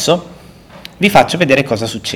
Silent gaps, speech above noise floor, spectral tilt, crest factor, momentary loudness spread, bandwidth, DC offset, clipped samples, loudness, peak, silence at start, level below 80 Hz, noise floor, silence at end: none; 25 dB; -4.5 dB/octave; 14 dB; 8 LU; over 20 kHz; under 0.1%; 0.9%; -13 LUFS; 0 dBFS; 0 s; -44 dBFS; -38 dBFS; 0 s